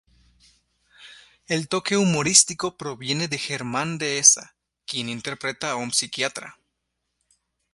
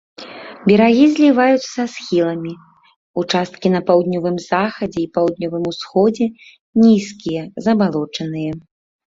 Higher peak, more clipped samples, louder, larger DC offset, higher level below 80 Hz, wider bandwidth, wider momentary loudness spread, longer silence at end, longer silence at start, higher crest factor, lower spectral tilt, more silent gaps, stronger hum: about the same, 0 dBFS vs -2 dBFS; neither; second, -21 LUFS vs -17 LUFS; neither; second, -62 dBFS vs -56 dBFS; first, 11.5 kHz vs 7.8 kHz; about the same, 14 LU vs 13 LU; first, 1.2 s vs 0.6 s; first, 1 s vs 0.2 s; first, 26 dB vs 16 dB; second, -2 dB/octave vs -6.5 dB/octave; second, none vs 2.96-3.14 s, 6.59-6.73 s; neither